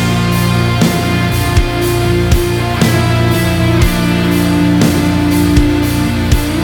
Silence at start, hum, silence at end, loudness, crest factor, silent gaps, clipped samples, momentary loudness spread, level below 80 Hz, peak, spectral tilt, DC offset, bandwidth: 0 s; none; 0 s; -12 LUFS; 12 dB; none; under 0.1%; 3 LU; -20 dBFS; 0 dBFS; -5.5 dB/octave; under 0.1%; over 20 kHz